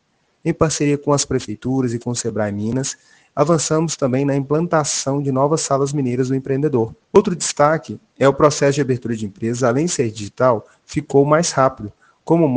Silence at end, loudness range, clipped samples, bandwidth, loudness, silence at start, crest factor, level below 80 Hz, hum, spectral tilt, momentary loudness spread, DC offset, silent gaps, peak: 0 s; 3 LU; under 0.1%; 10 kHz; -18 LUFS; 0.45 s; 18 dB; -50 dBFS; none; -5.5 dB/octave; 9 LU; under 0.1%; none; 0 dBFS